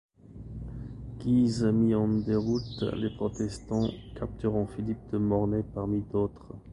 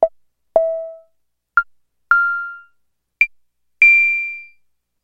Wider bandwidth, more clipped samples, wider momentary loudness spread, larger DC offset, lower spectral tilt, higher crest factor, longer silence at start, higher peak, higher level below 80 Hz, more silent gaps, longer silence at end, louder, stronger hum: first, 10.5 kHz vs 7.6 kHz; neither; second, 16 LU vs 21 LU; neither; first, -8 dB/octave vs -2.5 dB/octave; about the same, 16 dB vs 18 dB; first, 0.25 s vs 0 s; second, -14 dBFS vs 0 dBFS; first, -48 dBFS vs -58 dBFS; neither; second, 0 s vs 0.6 s; second, -29 LUFS vs -15 LUFS; neither